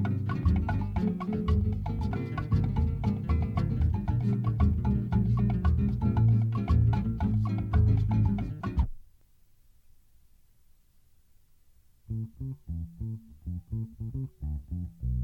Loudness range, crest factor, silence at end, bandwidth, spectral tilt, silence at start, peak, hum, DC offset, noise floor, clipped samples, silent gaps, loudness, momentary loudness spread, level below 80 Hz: 15 LU; 16 dB; 0 s; 5.2 kHz; -10 dB/octave; 0 s; -14 dBFS; none; under 0.1%; -60 dBFS; under 0.1%; none; -29 LUFS; 13 LU; -34 dBFS